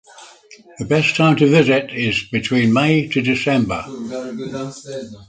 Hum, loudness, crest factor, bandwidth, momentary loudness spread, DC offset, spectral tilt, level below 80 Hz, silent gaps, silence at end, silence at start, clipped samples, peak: none; -17 LUFS; 18 dB; 9.2 kHz; 15 LU; under 0.1%; -6 dB/octave; -50 dBFS; none; 0.05 s; 0.15 s; under 0.1%; 0 dBFS